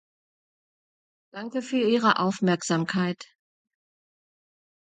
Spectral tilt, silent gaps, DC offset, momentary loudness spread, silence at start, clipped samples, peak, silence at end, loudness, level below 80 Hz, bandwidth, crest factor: -5 dB/octave; none; under 0.1%; 17 LU; 1.35 s; under 0.1%; -6 dBFS; 1.65 s; -25 LUFS; -74 dBFS; 9.4 kHz; 22 dB